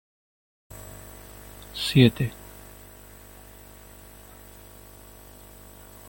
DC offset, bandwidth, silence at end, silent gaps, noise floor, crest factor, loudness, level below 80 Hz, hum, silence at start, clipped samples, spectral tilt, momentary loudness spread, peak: under 0.1%; 17 kHz; 3.8 s; none; -47 dBFS; 26 dB; -22 LUFS; -50 dBFS; 50 Hz at -50 dBFS; 1.6 s; under 0.1%; -6 dB/octave; 27 LU; -4 dBFS